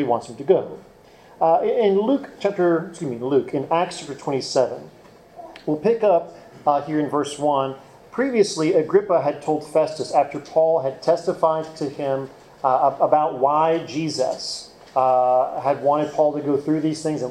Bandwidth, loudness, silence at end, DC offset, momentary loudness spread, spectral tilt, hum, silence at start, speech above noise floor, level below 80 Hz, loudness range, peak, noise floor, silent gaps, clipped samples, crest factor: 12 kHz; -21 LUFS; 0 s; under 0.1%; 10 LU; -5.5 dB/octave; none; 0 s; 22 dB; -64 dBFS; 3 LU; -4 dBFS; -43 dBFS; none; under 0.1%; 18 dB